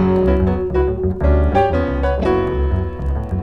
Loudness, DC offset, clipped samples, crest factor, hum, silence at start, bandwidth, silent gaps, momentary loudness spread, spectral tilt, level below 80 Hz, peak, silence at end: -18 LUFS; under 0.1%; under 0.1%; 14 dB; none; 0 s; 5.8 kHz; none; 6 LU; -9.5 dB/octave; -20 dBFS; -2 dBFS; 0 s